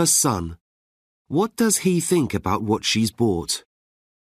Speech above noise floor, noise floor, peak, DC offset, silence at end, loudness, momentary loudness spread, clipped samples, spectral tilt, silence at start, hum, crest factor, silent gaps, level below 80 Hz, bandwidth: over 69 dB; under -90 dBFS; -8 dBFS; under 0.1%; 0.7 s; -21 LUFS; 9 LU; under 0.1%; -4 dB/octave; 0 s; none; 16 dB; 0.61-1.25 s; -50 dBFS; 15.5 kHz